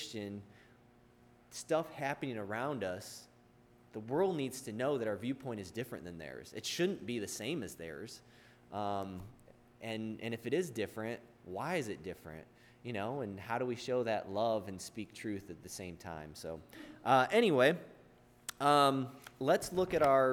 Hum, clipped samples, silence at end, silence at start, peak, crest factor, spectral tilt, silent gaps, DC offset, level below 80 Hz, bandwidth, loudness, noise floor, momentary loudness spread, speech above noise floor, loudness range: none; under 0.1%; 0 s; 0 s; -14 dBFS; 22 dB; -5 dB/octave; none; under 0.1%; -70 dBFS; 19.5 kHz; -36 LUFS; -64 dBFS; 19 LU; 28 dB; 9 LU